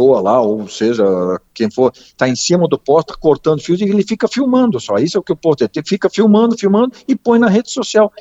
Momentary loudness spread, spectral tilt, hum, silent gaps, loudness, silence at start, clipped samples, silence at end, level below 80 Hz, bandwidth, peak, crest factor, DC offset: 6 LU; -5.5 dB/octave; none; none; -14 LUFS; 0 s; under 0.1%; 0.1 s; -50 dBFS; 8.2 kHz; 0 dBFS; 14 dB; under 0.1%